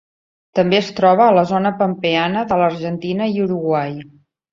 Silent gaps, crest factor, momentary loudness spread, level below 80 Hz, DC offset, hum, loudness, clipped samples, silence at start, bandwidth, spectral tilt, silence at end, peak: none; 16 dB; 10 LU; -58 dBFS; under 0.1%; none; -17 LUFS; under 0.1%; 0.55 s; 7.4 kHz; -7 dB/octave; 0.5 s; -2 dBFS